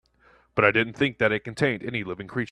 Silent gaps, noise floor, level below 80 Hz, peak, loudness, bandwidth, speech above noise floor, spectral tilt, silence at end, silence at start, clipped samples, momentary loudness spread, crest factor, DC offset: none; -60 dBFS; -58 dBFS; -4 dBFS; -25 LUFS; 11.5 kHz; 35 dB; -6 dB/octave; 0.05 s; 0.55 s; under 0.1%; 10 LU; 22 dB; under 0.1%